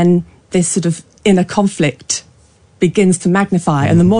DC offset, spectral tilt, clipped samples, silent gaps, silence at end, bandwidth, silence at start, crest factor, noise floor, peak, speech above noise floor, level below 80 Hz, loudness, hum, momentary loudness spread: under 0.1%; -5.5 dB/octave; under 0.1%; none; 0 s; 10.5 kHz; 0 s; 12 dB; -48 dBFS; -2 dBFS; 36 dB; -46 dBFS; -15 LUFS; none; 8 LU